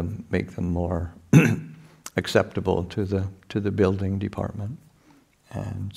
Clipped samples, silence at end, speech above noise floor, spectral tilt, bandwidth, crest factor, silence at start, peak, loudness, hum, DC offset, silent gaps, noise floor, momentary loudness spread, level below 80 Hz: under 0.1%; 0 s; 33 dB; -7 dB/octave; 15 kHz; 22 dB; 0 s; -2 dBFS; -25 LUFS; none; under 0.1%; none; -58 dBFS; 16 LU; -48 dBFS